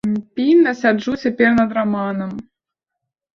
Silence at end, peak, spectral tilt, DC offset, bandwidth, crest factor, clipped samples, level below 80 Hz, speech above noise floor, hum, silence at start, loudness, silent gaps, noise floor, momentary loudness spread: 0.95 s; -2 dBFS; -7 dB/octave; under 0.1%; 7 kHz; 16 dB; under 0.1%; -54 dBFS; 65 dB; none; 0.05 s; -17 LUFS; none; -82 dBFS; 11 LU